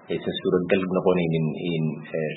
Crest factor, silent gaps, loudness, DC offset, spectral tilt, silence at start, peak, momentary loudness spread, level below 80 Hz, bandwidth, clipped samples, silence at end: 18 dB; none; -24 LUFS; under 0.1%; -11.5 dB/octave; 0.1 s; -6 dBFS; 6 LU; -58 dBFS; 4.1 kHz; under 0.1%; 0 s